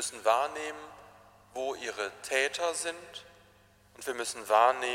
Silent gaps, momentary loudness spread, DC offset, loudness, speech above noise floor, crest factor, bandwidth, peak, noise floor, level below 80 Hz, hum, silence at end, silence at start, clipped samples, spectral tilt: none; 20 LU; under 0.1%; -31 LUFS; 31 dB; 22 dB; 16 kHz; -10 dBFS; -62 dBFS; -72 dBFS; none; 0 s; 0 s; under 0.1%; -0.5 dB/octave